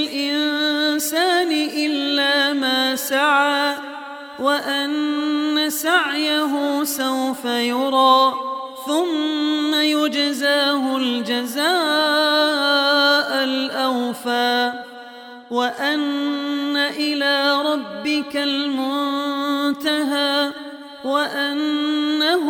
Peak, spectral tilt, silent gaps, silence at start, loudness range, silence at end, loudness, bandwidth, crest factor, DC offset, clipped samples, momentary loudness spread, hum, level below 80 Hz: -4 dBFS; -1.5 dB/octave; none; 0 s; 4 LU; 0 s; -19 LUFS; 17.5 kHz; 16 dB; under 0.1%; under 0.1%; 7 LU; none; -72 dBFS